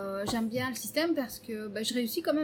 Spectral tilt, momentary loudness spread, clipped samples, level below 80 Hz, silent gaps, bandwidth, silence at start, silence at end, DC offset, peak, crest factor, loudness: -3.5 dB/octave; 8 LU; under 0.1%; -64 dBFS; none; 19 kHz; 0 s; 0 s; under 0.1%; -16 dBFS; 16 dB; -32 LUFS